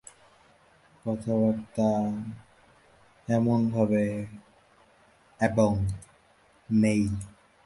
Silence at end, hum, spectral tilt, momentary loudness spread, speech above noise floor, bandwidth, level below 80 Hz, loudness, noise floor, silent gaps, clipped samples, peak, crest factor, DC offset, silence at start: 0.35 s; none; -8 dB/octave; 17 LU; 36 dB; 11.5 kHz; -52 dBFS; -27 LUFS; -61 dBFS; none; under 0.1%; -10 dBFS; 20 dB; under 0.1%; 1.05 s